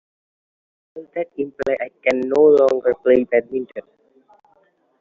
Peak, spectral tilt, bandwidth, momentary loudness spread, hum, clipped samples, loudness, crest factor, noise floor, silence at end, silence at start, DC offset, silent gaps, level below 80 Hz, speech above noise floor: -4 dBFS; -4.5 dB/octave; 7.4 kHz; 18 LU; none; under 0.1%; -18 LUFS; 16 dB; -60 dBFS; 1.2 s; 0.95 s; under 0.1%; none; -60 dBFS; 42 dB